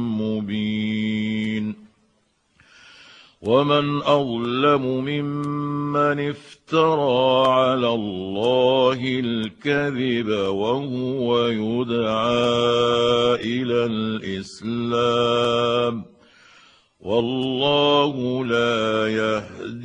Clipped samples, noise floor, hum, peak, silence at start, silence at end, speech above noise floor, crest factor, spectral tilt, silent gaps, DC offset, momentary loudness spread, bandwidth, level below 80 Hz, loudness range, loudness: under 0.1%; -65 dBFS; none; -4 dBFS; 0 s; 0 s; 45 dB; 18 dB; -6 dB/octave; none; under 0.1%; 8 LU; 9.6 kHz; -58 dBFS; 4 LU; -21 LUFS